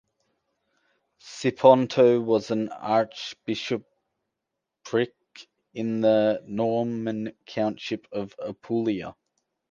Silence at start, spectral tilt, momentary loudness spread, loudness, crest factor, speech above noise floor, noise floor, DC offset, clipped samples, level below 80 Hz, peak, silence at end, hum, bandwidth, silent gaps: 1.25 s; -6 dB/octave; 15 LU; -25 LUFS; 22 dB; 60 dB; -84 dBFS; under 0.1%; under 0.1%; -68 dBFS; -4 dBFS; 0.6 s; none; 7.6 kHz; none